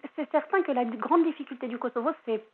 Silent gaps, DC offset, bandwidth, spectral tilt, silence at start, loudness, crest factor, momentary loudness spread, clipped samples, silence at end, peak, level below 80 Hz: none; under 0.1%; 4.2 kHz; -8.5 dB/octave; 0.05 s; -28 LUFS; 18 dB; 9 LU; under 0.1%; 0.1 s; -10 dBFS; under -90 dBFS